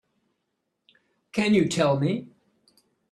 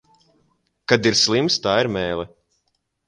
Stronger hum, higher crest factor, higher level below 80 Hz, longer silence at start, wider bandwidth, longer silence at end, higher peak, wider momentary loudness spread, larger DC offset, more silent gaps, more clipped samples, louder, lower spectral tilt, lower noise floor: neither; about the same, 18 dB vs 22 dB; second, -64 dBFS vs -52 dBFS; first, 1.35 s vs 0.9 s; about the same, 12 kHz vs 11 kHz; about the same, 0.85 s vs 0.8 s; second, -10 dBFS vs 0 dBFS; second, 11 LU vs 15 LU; neither; neither; neither; second, -24 LUFS vs -19 LUFS; first, -6 dB/octave vs -3.5 dB/octave; first, -79 dBFS vs -72 dBFS